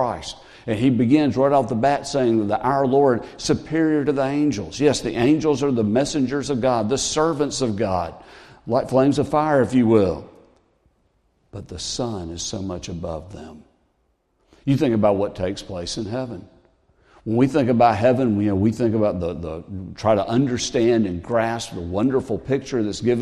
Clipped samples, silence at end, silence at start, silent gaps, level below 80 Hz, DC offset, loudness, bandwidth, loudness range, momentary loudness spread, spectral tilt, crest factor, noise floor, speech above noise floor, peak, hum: under 0.1%; 0 s; 0 s; none; -48 dBFS; under 0.1%; -21 LUFS; 12 kHz; 7 LU; 13 LU; -6 dB/octave; 18 dB; -67 dBFS; 47 dB; -4 dBFS; none